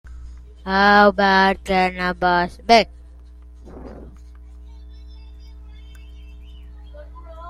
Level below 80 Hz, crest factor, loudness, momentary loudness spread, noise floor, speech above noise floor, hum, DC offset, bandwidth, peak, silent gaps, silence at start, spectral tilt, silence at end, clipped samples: -38 dBFS; 20 dB; -16 LUFS; 27 LU; -42 dBFS; 25 dB; 60 Hz at -40 dBFS; under 0.1%; 13.5 kHz; -2 dBFS; none; 0.05 s; -5 dB/octave; 0 s; under 0.1%